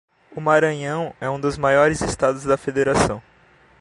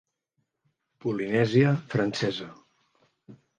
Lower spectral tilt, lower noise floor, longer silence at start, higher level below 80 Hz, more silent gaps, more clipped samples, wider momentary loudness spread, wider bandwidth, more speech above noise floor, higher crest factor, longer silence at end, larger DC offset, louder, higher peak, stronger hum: second, -5 dB/octave vs -7 dB/octave; second, -54 dBFS vs -78 dBFS; second, 0.35 s vs 1.05 s; first, -44 dBFS vs -68 dBFS; neither; neither; second, 9 LU vs 14 LU; first, 11.5 kHz vs 9.2 kHz; second, 34 dB vs 53 dB; about the same, 18 dB vs 20 dB; first, 0.6 s vs 0.25 s; neither; first, -20 LUFS vs -26 LUFS; first, -2 dBFS vs -8 dBFS; neither